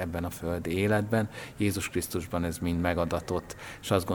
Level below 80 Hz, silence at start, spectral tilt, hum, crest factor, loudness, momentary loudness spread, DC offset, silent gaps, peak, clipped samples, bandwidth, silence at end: -48 dBFS; 0 s; -5.5 dB/octave; none; 20 dB; -30 LUFS; 8 LU; under 0.1%; none; -10 dBFS; under 0.1%; over 20 kHz; 0 s